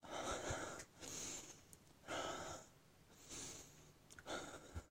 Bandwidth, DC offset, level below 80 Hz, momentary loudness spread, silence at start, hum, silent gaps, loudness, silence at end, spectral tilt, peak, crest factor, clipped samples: 16 kHz; under 0.1%; -66 dBFS; 18 LU; 0 s; none; none; -49 LUFS; 0 s; -2.5 dB/octave; -32 dBFS; 18 dB; under 0.1%